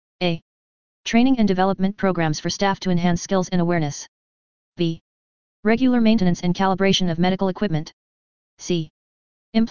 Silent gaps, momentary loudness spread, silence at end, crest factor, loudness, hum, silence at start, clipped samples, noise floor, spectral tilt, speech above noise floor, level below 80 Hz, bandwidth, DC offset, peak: 0.42-1.04 s, 4.08-4.72 s, 5.01-5.63 s, 7.93-8.57 s, 8.90-9.53 s; 12 LU; 0 s; 18 dB; -21 LUFS; none; 0.2 s; under 0.1%; under -90 dBFS; -5.5 dB/octave; over 70 dB; -48 dBFS; 7.2 kHz; 2%; -4 dBFS